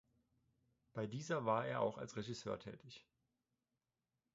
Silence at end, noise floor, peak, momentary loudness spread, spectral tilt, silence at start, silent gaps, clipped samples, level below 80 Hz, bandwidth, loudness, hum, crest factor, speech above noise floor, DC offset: 1.35 s; under -90 dBFS; -24 dBFS; 18 LU; -5 dB/octave; 0.95 s; none; under 0.1%; -78 dBFS; 7.6 kHz; -43 LUFS; none; 22 dB; over 47 dB; under 0.1%